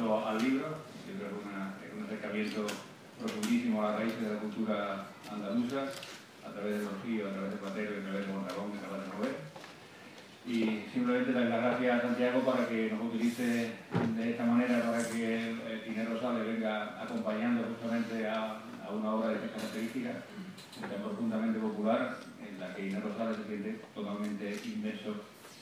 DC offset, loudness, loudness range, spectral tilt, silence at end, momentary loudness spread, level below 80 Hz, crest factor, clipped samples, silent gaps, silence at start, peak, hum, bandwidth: under 0.1%; -35 LUFS; 7 LU; -5.5 dB/octave; 0 s; 13 LU; -82 dBFS; 18 dB; under 0.1%; none; 0 s; -18 dBFS; none; 15.5 kHz